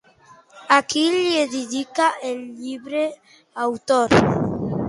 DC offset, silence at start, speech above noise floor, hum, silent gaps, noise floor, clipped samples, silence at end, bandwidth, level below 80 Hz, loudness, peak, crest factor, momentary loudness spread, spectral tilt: under 0.1%; 0.55 s; 31 dB; none; none; -51 dBFS; under 0.1%; 0 s; 11.5 kHz; -50 dBFS; -20 LUFS; -2 dBFS; 18 dB; 13 LU; -4.5 dB/octave